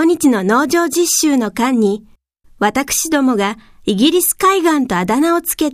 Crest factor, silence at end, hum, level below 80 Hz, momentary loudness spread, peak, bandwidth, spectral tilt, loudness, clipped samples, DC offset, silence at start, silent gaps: 14 dB; 0 s; none; -48 dBFS; 6 LU; 0 dBFS; 15.5 kHz; -3.5 dB/octave; -14 LUFS; under 0.1%; under 0.1%; 0 s; none